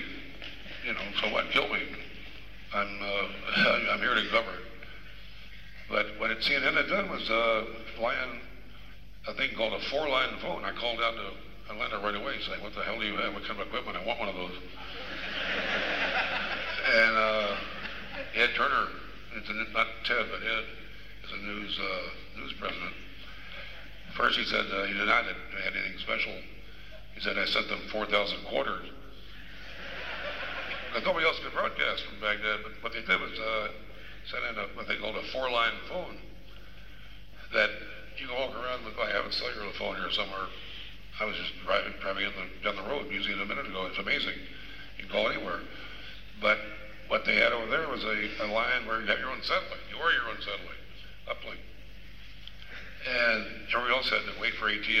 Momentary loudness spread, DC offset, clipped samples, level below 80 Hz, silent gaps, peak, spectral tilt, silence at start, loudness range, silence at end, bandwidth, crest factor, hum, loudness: 20 LU; 0.7%; under 0.1%; -52 dBFS; none; -10 dBFS; -4 dB/octave; 0 s; 6 LU; 0 s; 15.5 kHz; 22 dB; none; -30 LUFS